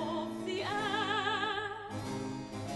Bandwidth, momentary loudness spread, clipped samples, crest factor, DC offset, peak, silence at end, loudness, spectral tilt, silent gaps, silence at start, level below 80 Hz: 12 kHz; 9 LU; under 0.1%; 16 dB; under 0.1%; -20 dBFS; 0 s; -35 LUFS; -4.5 dB/octave; none; 0 s; -64 dBFS